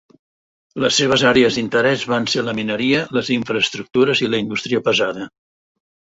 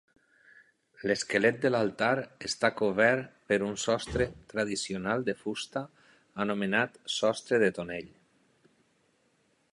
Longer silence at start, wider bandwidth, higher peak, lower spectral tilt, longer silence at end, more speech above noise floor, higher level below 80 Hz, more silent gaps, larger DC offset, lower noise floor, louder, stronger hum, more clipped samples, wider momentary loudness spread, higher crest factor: second, 0.75 s vs 1 s; second, 8 kHz vs 11.5 kHz; first, -2 dBFS vs -8 dBFS; about the same, -4 dB/octave vs -4 dB/octave; second, 0.85 s vs 1.65 s; first, over 72 dB vs 41 dB; about the same, -54 dBFS vs -58 dBFS; neither; neither; first, under -90 dBFS vs -71 dBFS; first, -17 LUFS vs -30 LUFS; neither; neither; second, 8 LU vs 11 LU; second, 16 dB vs 22 dB